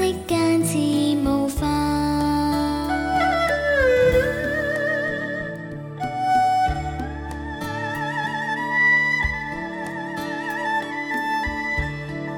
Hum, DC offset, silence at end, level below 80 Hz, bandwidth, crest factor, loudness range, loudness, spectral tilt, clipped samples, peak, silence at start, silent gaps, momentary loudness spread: none; under 0.1%; 0 s; -38 dBFS; 17.5 kHz; 14 dB; 4 LU; -22 LUFS; -5 dB/octave; under 0.1%; -8 dBFS; 0 s; none; 12 LU